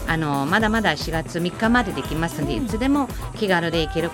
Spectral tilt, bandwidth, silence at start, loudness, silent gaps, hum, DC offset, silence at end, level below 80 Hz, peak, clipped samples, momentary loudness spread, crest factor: -5.5 dB/octave; 17 kHz; 0 s; -22 LUFS; none; none; under 0.1%; 0 s; -36 dBFS; -4 dBFS; under 0.1%; 6 LU; 18 dB